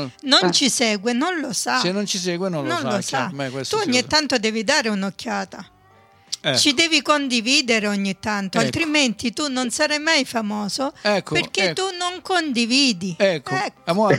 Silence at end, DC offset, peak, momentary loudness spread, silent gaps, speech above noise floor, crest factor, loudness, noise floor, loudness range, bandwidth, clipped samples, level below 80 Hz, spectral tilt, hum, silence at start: 0 s; under 0.1%; -4 dBFS; 8 LU; none; 32 dB; 18 dB; -20 LUFS; -53 dBFS; 3 LU; 16.5 kHz; under 0.1%; -60 dBFS; -3 dB/octave; none; 0 s